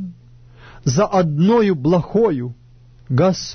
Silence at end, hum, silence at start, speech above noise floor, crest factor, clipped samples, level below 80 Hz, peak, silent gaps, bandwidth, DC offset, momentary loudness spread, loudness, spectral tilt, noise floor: 0 s; none; 0 s; 30 dB; 14 dB; under 0.1%; -46 dBFS; -4 dBFS; none; 6.6 kHz; under 0.1%; 11 LU; -17 LUFS; -6.5 dB/octave; -46 dBFS